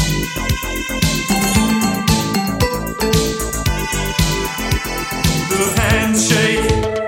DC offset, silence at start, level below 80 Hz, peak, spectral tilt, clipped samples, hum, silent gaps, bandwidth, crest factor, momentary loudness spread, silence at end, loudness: under 0.1%; 0 s; -26 dBFS; 0 dBFS; -4 dB/octave; under 0.1%; none; none; 17 kHz; 16 dB; 6 LU; 0 s; -17 LUFS